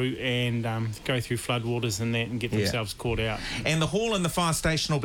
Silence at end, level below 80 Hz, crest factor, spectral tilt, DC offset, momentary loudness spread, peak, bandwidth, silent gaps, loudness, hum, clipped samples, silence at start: 0 s; -46 dBFS; 16 dB; -4.5 dB/octave; under 0.1%; 4 LU; -12 dBFS; 18.5 kHz; none; -27 LUFS; none; under 0.1%; 0 s